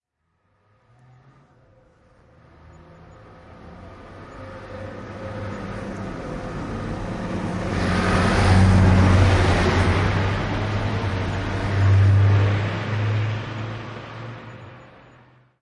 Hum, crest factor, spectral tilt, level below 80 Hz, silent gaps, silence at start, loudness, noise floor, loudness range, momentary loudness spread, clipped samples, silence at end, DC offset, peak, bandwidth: none; 18 dB; -7 dB/octave; -34 dBFS; none; 3.3 s; -21 LUFS; -71 dBFS; 18 LU; 22 LU; under 0.1%; 0.75 s; under 0.1%; -4 dBFS; 10.5 kHz